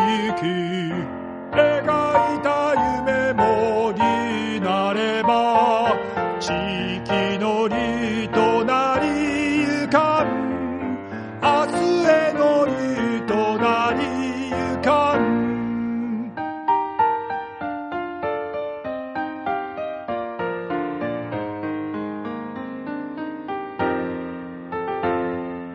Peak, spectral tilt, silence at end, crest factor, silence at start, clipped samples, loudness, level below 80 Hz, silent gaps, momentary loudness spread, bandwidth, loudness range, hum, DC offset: -4 dBFS; -5.5 dB/octave; 0 s; 18 dB; 0 s; under 0.1%; -22 LUFS; -52 dBFS; none; 11 LU; 10.5 kHz; 8 LU; none; under 0.1%